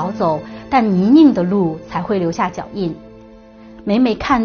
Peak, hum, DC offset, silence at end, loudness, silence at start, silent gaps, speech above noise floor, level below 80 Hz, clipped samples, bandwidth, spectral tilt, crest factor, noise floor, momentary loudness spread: 0 dBFS; none; under 0.1%; 0 s; -16 LUFS; 0 s; none; 25 dB; -44 dBFS; under 0.1%; 6.8 kHz; -6 dB/octave; 16 dB; -40 dBFS; 14 LU